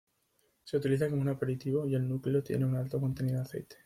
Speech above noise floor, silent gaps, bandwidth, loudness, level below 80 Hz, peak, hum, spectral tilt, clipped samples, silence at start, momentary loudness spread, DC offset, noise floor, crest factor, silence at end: 43 dB; none; 14 kHz; -32 LUFS; -64 dBFS; -16 dBFS; none; -8.5 dB/octave; under 0.1%; 0.65 s; 4 LU; under 0.1%; -74 dBFS; 16 dB; 0.1 s